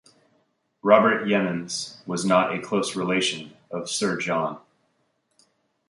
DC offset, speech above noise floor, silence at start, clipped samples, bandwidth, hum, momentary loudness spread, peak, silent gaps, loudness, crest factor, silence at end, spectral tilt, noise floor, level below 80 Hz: under 0.1%; 48 dB; 0.85 s; under 0.1%; 11.5 kHz; none; 13 LU; -2 dBFS; none; -23 LUFS; 24 dB; 1.3 s; -4 dB/octave; -71 dBFS; -68 dBFS